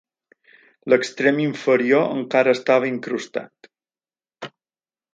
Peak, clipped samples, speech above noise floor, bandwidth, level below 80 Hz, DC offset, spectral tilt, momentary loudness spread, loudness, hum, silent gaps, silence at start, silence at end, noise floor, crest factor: -2 dBFS; under 0.1%; over 71 dB; 9 kHz; -72 dBFS; under 0.1%; -5.5 dB/octave; 21 LU; -20 LUFS; none; none; 0.85 s; 0.65 s; under -90 dBFS; 20 dB